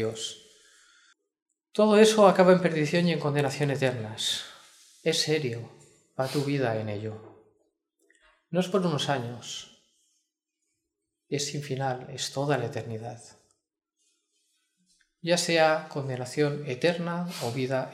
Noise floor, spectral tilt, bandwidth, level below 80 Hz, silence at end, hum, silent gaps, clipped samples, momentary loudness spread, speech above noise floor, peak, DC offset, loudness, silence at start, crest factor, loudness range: -83 dBFS; -5 dB/octave; 15 kHz; -74 dBFS; 0 s; none; 1.42-1.46 s; under 0.1%; 17 LU; 57 dB; -6 dBFS; under 0.1%; -26 LUFS; 0 s; 24 dB; 11 LU